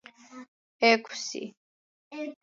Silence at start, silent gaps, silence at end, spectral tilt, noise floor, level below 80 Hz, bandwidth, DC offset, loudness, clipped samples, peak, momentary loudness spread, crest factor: 0.3 s; 0.48-0.79 s, 1.57-2.11 s; 0.1 s; -2 dB/octave; under -90 dBFS; -86 dBFS; 7.8 kHz; under 0.1%; -27 LUFS; under 0.1%; -8 dBFS; 26 LU; 22 dB